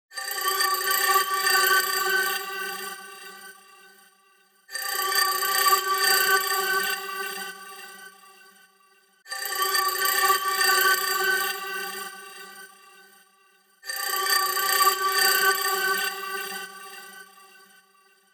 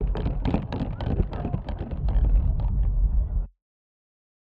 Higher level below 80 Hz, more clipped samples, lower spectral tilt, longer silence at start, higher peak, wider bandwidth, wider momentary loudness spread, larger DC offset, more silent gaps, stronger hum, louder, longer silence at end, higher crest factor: second, -86 dBFS vs -26 dBFS; neither; second, 1.5 dB/octave vs -10 dB/octave; about the same, 0.1 s vs 0 s; about the same, -8 dBFS vs -10 dBFS; first, 19.5 kHz vs 4.7 kHz; first, 21 LU vs 7 LU; neither; neither; neither; first, -23 LUFS vs -28 LUFS; first, 1.1 s vs 0.95 s; about the same, 18 dB vs 16 dB